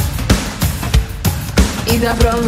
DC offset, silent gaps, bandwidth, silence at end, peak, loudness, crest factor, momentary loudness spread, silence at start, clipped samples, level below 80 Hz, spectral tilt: under 0.1%; none; 16.5 kHz; 0 s; 0 dBFS; -16 LUFS; 14 dB; 5 LU; 0 s; under 0.1%; -20 dBFS; -5 dB/octave